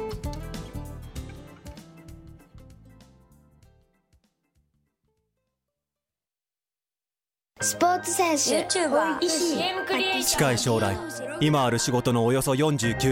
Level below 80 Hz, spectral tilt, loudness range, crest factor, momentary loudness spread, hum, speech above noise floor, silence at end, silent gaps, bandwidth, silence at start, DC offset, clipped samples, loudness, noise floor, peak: -48 dBFS; -4 dB/octave; 19 LU; 18 dB; 18 LU; none; over 66 dB; 0 s; none; 16.5 kHz; 0 s; under 0.1%; under 0.1%; -24 LUFS; under -90 dBFS; -10 dBFS